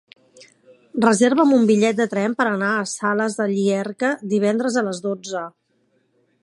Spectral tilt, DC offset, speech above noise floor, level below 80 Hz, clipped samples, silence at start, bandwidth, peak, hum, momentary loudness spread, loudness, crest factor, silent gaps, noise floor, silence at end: -5 dB/octave; under 0.1%; 46 dB; -72 dBFS; under 0.1%; 0.95 s; 11.5 kHz; -2 dBFS; none; 11 LU; -20 LUFS; 20 dB; none; -65 dBFS; 0.95 s